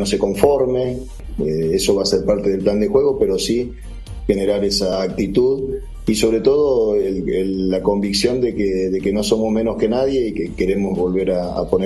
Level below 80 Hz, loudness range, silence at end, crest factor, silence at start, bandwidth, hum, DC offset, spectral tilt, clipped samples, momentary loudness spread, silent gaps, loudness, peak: -34 dBFS; 1 LU; 0 s; 18 dB; 0 s; 13 kHz; none; under 0.1%; -5.5 dB/octave; under 0.1%; 7 LU; none; -18 LUFS; 0 dBFS